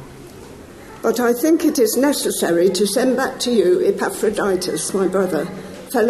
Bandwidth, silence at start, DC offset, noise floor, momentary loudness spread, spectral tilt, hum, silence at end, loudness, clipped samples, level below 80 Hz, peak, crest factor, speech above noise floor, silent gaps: 13 kHz; 0 s; under 0.1%; -38 dBFS; 20 LU; -4 dB/octave; none; 0 s; -18 LUFS; under 0.1%; -52 dBFS; -4 dBFS; 14 dB; 21 dB; none